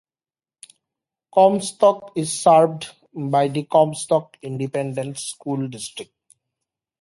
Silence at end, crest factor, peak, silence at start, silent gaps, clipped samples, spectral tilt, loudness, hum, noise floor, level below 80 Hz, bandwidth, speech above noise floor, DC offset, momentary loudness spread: 1 s; 18 dB; -2 dBFS; 1.35 s; none; under 0.1%; -5 dB/octave; -20 LUFS; none; under -90 dBFS; -70 dBFS; 11.5 kHz; over 70 dB; under 0.1%; 16 LU